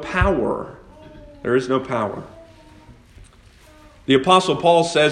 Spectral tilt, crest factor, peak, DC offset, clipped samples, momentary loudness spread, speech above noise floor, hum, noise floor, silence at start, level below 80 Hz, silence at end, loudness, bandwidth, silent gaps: -5 dB/octave; 20 dB; 0 dBFS; under 0.1%; under 0.1%; 16 LU; 30 dB; none; -48 dBFS; 0 s; -38 dBFS; 0 s; -19 LUFS; 10.5 kHz; none